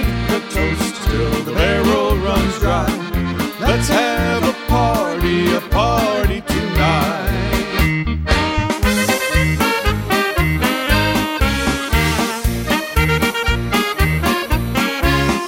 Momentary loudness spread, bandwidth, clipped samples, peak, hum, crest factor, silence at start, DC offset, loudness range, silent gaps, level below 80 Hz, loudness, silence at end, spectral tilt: 4 LU; 17 kHz; under 0.1%; 0 dBFS; none; 16 dB; 0 s; under 0.1%; 1 LU; none; -24 dBFS; -17 LUFS; 0 s; -5 dB/octave